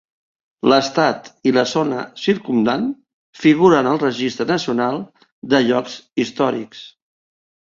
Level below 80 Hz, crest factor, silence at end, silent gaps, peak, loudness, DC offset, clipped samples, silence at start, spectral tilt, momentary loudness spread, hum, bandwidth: -60 dBFS; 18 dB; 0.9 s; 3.13-3.33 s, 5.32-5.42 s; -2 dBFS; -18 LUFS; under 0.1%; under 0.1%; 0.65 s; -5.5 dB/octave; 13 LU; none; 7.6 kHz